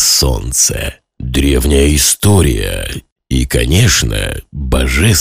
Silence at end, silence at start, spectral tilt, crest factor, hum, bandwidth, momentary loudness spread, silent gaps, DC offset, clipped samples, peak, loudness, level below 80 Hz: 0 s; 0 s; -3.5 dB/octave; 12 dB; none; 16 kHz; 12 LU; 3.12-3.16 s; under 0.1%; under 0.1%; 0 dBFS; -12 LUFS; -18 dBFS